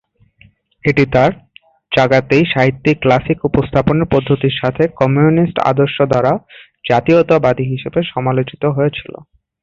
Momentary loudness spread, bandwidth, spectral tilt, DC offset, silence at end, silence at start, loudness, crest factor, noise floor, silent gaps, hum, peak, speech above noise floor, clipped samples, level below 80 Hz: 7 LU; 7.4 kHz; -8 dB/octave; under 0.1%; 0.6 s; 0.85 s; -14 LUFS; 14 dB; -50 dBFS; none; none; 0 dBFS; 36 dB; under 0.1%; -40 dBFS